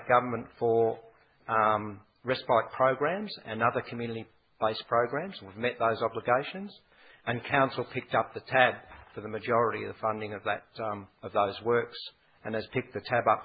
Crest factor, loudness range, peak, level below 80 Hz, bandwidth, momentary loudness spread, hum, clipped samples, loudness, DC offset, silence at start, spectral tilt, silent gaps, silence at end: 24 dB; 2 LU; -6 dBFS; -64 dBFS; 5 kHz; 14 LU; none; under 0.1%; -30 LUFS; under 0.1%; 0 s; -9.5 dB/octave; none; 0 s